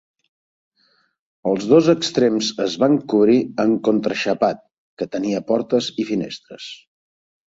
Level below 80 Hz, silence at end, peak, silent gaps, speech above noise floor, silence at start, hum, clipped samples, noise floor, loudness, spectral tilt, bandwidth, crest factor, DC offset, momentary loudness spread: -62 dBFS; 0.85 s; -2 dBFS; 4.78-4.97 s; 44 dB; 1.45 s; none; under 0.1%; -63 dBFS; -19 LUFS; -5.5 dB/octave; 8 kHz; 18 dB; under 0.1%; 15 LU